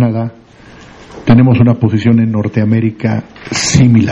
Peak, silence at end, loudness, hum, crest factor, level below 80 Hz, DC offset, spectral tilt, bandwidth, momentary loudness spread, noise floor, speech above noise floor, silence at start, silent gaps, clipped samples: 0 dBFS; 0 s; -11 LUFS; none; 10 dB; -38 dBFS; under 0.1%; -6 dB/octave; 11 kHz; 12 LU; -35 dBFS; 25 dB; 0 s; none; 0.1%